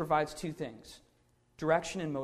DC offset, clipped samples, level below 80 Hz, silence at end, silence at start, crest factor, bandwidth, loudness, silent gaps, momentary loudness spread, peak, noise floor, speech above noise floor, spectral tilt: under 0.1%; under 0.1%; -62 dBFS; 0 s; 0 s; 20 dB; 15 kHz; -34 LUFS; none; 17 LU; -14 dBFS; -70 dBFS; 36 dB; -5 dB/octave